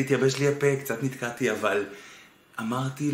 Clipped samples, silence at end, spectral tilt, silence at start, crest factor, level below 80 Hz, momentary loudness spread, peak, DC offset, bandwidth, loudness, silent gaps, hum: under 0.1%; 0 s; -5.5 dB/octave; 0 s; 18 dB; -68 dBFS; 15 LU; -10 dBFS; under 0.1%; 16 kHz; -27 LUFS; none; none